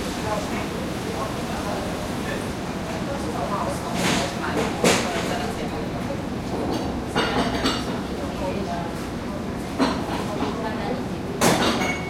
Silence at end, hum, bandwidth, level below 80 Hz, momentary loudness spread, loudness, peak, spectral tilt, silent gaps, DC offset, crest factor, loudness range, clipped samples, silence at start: 0 s; none; 16.5 kHz; -42 dBFS; 8 LU; -25 LUFS; -4 dBFS; -4.5 dB/octave; none; under 0.1%; 20 dB; 3 LU; under 0.1%; 0 s